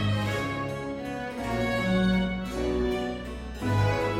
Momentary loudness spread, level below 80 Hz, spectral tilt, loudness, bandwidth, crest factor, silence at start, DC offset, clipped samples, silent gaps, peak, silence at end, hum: 9 LU; -40 dBFS; -6.5 dB/octave; -28 LUFS; 16 kHz; 14 dB; 0 s; under 0.1%; under 0.1%; none; -14 dBFS; 0 s; none